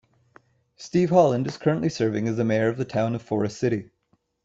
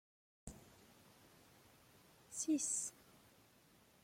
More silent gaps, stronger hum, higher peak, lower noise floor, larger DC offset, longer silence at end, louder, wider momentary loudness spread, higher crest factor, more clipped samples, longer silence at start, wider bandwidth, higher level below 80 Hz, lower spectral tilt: neither; neither; first, -6 dBFS vs -28 dBFS; about the same, -69 dBFS vs -69 dBFS; neither; second, 0.6 s vs 1.1 s; first, -24 LUFS vs -40 LUFS; second, 8 LU vs 28 LU; about the same, 18 dB vs 20 dB; neither; first, 0.8 s vs 0.45 s; second, 8 kHz vs 16.5 kHz; first, -62 dBFS vs -74 dBFS; first, -7 dB/octave vs -2.5 dB/octave